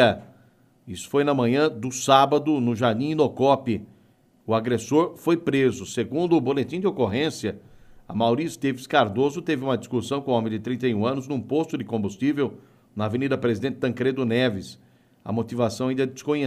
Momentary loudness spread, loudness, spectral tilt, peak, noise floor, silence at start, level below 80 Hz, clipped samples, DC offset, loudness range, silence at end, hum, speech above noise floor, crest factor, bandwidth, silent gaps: 9 LU; -24 LUFS; -6 dB/octave; -2 dBFS; -59 dBFS; 0 s; -62 dBFS; under 0.1%; under 0.1%; 4 LU; 0 s; none; 36 dB; 20 dB; 15 kHz; none